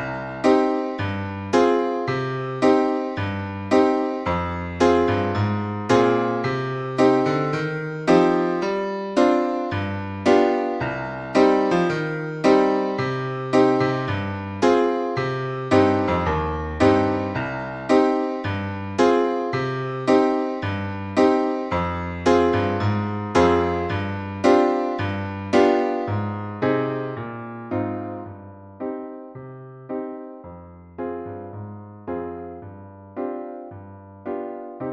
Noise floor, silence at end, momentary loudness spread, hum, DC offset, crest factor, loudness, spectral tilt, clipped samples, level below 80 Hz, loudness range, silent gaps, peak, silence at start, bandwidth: -42 dBFS; 0 s; 16 LU; none; under 0.1%; 18 dB; -22 LUFS; -7 dB/octave; under 0.1%; -48 dBFS; 13 LU; none; -4 dBFS; 0 s; 9.8 kHz